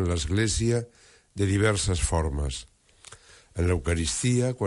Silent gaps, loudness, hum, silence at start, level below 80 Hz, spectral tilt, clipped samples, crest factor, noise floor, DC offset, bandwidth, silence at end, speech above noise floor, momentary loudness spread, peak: none; -26 LUFS; none; 0 s; -34 dBFS; -5 dB/octave; under 0.1%; 14 dB; -51 dBFS; under 0.1%; 11.5 kHz; 0 s; 26 dB; 12 LU; -12 dBFS